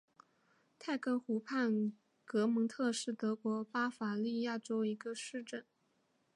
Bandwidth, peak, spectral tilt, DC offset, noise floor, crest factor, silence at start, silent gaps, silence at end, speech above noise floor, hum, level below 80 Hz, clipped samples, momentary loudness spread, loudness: 11 kHz; -24 dBFS; -5 dB/octave; under 0.1%; -78 dBFS; 14 dB; 0.8 s; none; 0.75 s; 41 dB; none; under -90 dBFS; under 0.1%; 9 LU; -38 LUFS